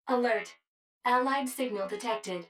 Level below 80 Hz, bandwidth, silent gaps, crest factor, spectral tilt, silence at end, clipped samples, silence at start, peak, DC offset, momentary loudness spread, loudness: -86 dBFS; 17.5 kHz; 0.67-1.01 s; 18 dB; -3.5 dB/octave; 0.05 s; under 0.1%; 0.05 s; -14 dBFS; under 0.1%; 7 LU; -30 LUFS